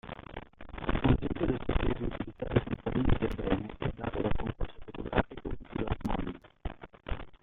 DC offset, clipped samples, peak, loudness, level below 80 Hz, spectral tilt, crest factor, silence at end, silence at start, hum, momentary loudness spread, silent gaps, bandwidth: under 0.1%; under 0.1%; -12 dBFS; -34 LUFS; -38 dBFS; -9 dB/octave; 20 dB; 0.1 s; 0.05 s; none; 15 LU; none; 4.3 kHz